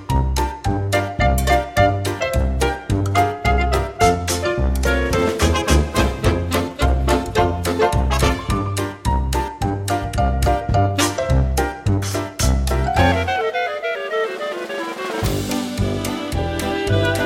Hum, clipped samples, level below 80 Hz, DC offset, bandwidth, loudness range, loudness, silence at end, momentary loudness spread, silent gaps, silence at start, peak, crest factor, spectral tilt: none; under 0.1%; -24 dBFS; under 0.1%; 16.5 kHz; 3 LU; -20 LUFS; 0 s; 6 LU; none; 0 s; -2 dBFS; 16 dB; -5 dB/octave